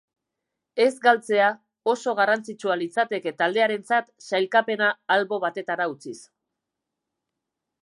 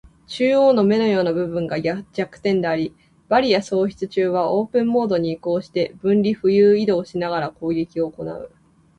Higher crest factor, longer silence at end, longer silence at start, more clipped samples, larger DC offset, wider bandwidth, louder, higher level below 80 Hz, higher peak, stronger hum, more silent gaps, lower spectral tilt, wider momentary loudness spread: about the same, 20 dB vs 16 dB; first, 1.6 s vs 0.5 s; first, 0.75 s vs 0.3 s; neither; neither; first, 11.5 kHz vs 10 kHz; second, -23 LUFS vs -20 LUFS; second, -84 dBFS vs -56 dBFS; about the same, -6 dBFS vs -4 dBFS; neither; neither; second, -4 dB/octave vs -7 dB/octave; about the same, 8 LU vs 10 LU